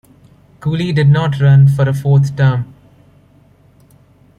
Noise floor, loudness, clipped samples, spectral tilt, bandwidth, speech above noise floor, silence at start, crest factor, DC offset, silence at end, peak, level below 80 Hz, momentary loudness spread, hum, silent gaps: -48 dBFS; -13 LUFS; under 0.1%; -8.5 dB/octave; 6.8 kHz; 37 dB; 0.6 s; 12 dB; under 0.1%; 1.75 s; -2 dBFS; -46 dBFS; 12 LU; none; none